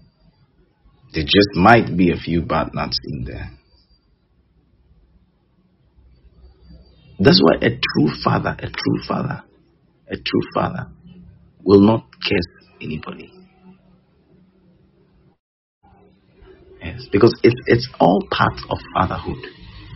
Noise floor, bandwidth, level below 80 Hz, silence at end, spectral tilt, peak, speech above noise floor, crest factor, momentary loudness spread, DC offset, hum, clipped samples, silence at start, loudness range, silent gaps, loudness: -59 dBFS; 6.2 kHz; -42 dBFS; 0 s; -4.5 dB/octave; 0 dBFS; 42 dB; 20 dB; 20 LU; under 0.1%; none; under 0.1%; 1.15 s; 11 LU; 15.40-15.81 s; -18 LUFS